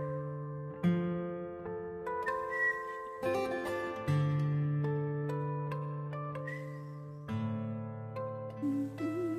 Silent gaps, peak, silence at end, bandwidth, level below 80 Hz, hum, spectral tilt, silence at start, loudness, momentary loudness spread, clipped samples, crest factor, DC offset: none; -20 dBFS; 0 s; 12.5 kHz; -66 dBFS; none; -8 dB/octave; 0 s; -36 LUFS; 10 LU; under 0.1%; 16 dB; under 0.1%